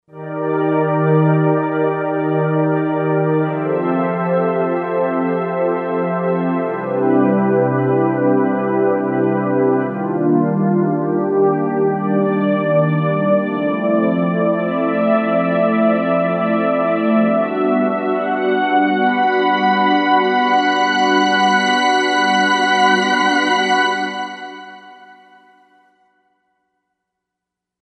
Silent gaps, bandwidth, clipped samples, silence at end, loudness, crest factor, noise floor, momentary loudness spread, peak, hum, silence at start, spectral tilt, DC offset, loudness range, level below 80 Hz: none; 10 kHz; under 0.1%; 2.7 s; -16 LUFS; 14 dB; -82 dBFS; 5 LU; -2 dBFS; none; 0.15 s; -6 dB/octave; under 0.1%; 4 LU; -72 dBFS